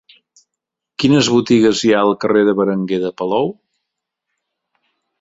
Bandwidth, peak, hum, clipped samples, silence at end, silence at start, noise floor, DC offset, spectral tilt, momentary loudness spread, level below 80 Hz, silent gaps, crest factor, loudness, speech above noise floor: 8 kHz; -2 dBFS; none; under 0.1%; 1.7 s; 1 s; -81 dBFS; under 0.1%; -5 dB/octave; 8 LU; -56 dBFS; none; 16 dB; -15 LUFS; 67 dB